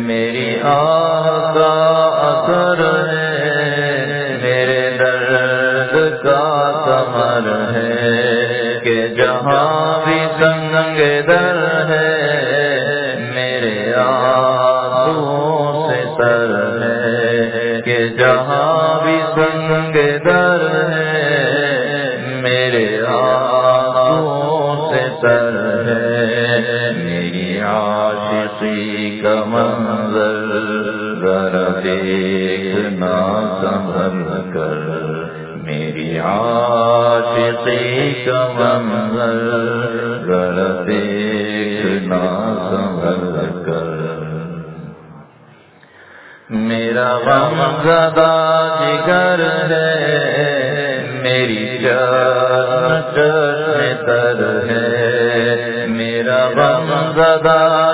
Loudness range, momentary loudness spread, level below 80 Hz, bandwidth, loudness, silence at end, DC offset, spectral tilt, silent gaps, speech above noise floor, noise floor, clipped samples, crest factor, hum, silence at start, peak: 5 LU; 6 LU; -52 dBFS; 4 kHz; -15 LUFS; 0 s; under 0.1%; -9.5 dB/octave; none; 31 dB; -44 dBFS; under 0.1%; 14 dB; none; 0 s; 0 dBFS